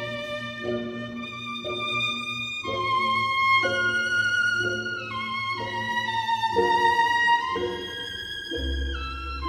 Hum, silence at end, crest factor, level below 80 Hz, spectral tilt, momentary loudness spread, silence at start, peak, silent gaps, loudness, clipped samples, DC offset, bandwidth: none; 0 s; 16 dB; -42 dBFS; -3.5 dB/octave; 11 LU; 0 s; -10 dBFS; none; -25 LUFS; under 0.1%; under 0.1%; 15.5 kHz